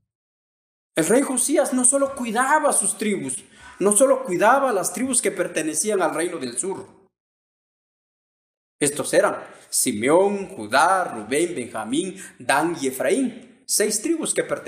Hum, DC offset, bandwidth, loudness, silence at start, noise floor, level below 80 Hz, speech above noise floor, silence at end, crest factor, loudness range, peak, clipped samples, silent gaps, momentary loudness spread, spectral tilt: none; under 0.1%; 15.5 kHz; -21 LUFS; 0.95 s; under -90 dBFS; -66 dBFS; over 69 dB; 0 s; 20 dB; 7 LU; -4 dBFS; under 0.1%; 7.20-8.79 s; 10 LU; -2.5 dB/octave